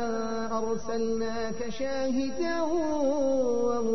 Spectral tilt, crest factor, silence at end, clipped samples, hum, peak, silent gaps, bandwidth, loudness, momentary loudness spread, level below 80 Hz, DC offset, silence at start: -5 dB/octave; 12 dB; 0 s; under 0.1%; none; -16 dBFS; none; 6.6 kHz; -29 LUFS; 6 LU; -52 dBFS; 2%; 0 s